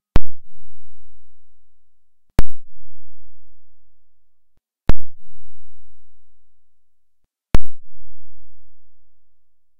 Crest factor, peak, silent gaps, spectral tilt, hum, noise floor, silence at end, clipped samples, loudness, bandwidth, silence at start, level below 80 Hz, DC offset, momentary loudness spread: 12 dB; 0 dBFS; none; -7 dB/octave; none; -58 dBFS; 0.6 s; 2%; -27 LUFS; 5.8 kHz; 0.15 s; -32 dBFS; under 0.1%; 24 LU